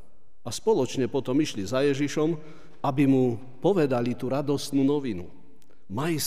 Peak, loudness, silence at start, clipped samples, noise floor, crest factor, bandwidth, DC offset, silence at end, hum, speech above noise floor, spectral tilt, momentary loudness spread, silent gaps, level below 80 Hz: -10 dBFS; -26 LUFS; 0.45 s; under 0.1%; -58 dBFS; 16 dB; 15.5 kHz; 1%; 0 s; none; 33 dB; -6 dB/octave; 12 LU; none; -64 dBFS